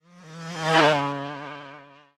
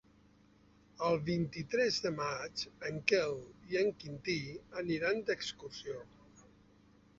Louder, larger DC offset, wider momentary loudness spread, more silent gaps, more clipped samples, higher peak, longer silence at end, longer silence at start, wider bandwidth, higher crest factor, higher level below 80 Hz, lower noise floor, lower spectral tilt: first, -22 LUFS vs -36 LUFS; neither; first, 22 LU vs 12 LU; neither; neither; first, -4 dBFS vs -12 dBFS; second, 0.3 s vs 0.75 s; second, 0.15 s vs 1 s; first, 13.5 kHz vs 7.6 kHz; about the same, 22 dB vs 26 dB; about the same, -68 dBFS vs -66 dBFS; second, -47 dBFS vs -65 dBFS; about the same, -4.5 dB/octave vs -3.5 dB/octave